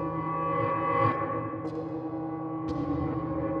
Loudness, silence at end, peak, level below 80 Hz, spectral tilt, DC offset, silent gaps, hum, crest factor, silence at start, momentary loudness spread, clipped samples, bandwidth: -30 LUFS; 0 s; -14 dBFS; -52 dBFS; -9.5 dB/octave; under 0.1%; none; none; 16 dB; 0 s; 8 LU; under 0.1%; 6.4 kHz